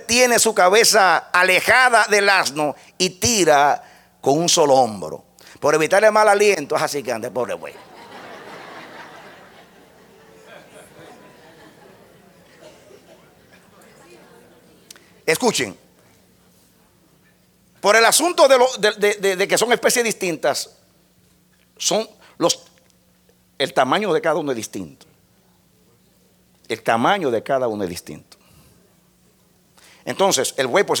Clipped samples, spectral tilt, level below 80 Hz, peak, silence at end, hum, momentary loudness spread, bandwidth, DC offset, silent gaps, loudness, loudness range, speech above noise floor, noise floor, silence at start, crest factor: under 0.1%; -2 dB/octave; -60 dBFS; 0 dBFS; 0 s; none; 21 LU; 19 kHz; under 0.1%; none; -17 LUFS; 10 LU; 40 dB; -57 dBFS; 0 s; 20 dB